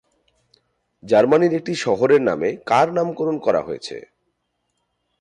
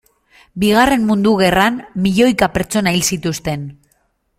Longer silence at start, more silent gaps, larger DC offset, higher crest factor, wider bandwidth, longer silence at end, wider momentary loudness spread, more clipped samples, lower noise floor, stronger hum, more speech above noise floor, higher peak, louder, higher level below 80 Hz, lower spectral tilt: first, 1.05 s vs 0.55 s; neither; neither; about the same, 16 dB vs 16 dB; second, 10.5 kHz vs 16.5 kHz; first, 1.2 s vs 0.65 s; about the same, 13 LU vs 11 LU; neither; first, -73 dBFS vs -62 dBFS; first, 60 Hz at -50 dBFS vs none; first, 55 dB vs 47 dB; second, -4 dBFS vs 0 dBFS; second, -19 LUFS vs -15 LUFS; second, -62 dBFS vs -40 dBFS; first, -6 dB/octave vs -4.5 dB/octave